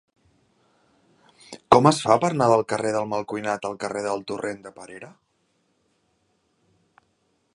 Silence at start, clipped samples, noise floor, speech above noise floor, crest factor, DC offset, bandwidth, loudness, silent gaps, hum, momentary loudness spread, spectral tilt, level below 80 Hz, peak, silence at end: 1.5 s; under 0.1%; -69 dBFS; 46 dB; 26 dB; under 0.1%; 11.5 kHz; -22 LUFS; none; none; 24 LU; -5.5 dB/octave; -60 dBFS; 0 dBFS; 2.45 s